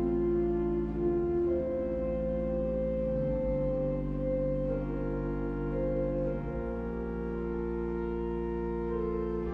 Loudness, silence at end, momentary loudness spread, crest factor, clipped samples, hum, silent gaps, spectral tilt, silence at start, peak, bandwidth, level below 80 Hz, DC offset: -32 LUFS; 0 s; 5 LU; 12 dB; under 0.1%; none; none; -11 dB/octave; 0 s; -20 dBFS; 4.4 kHz; -40 dBFS; under 0.1%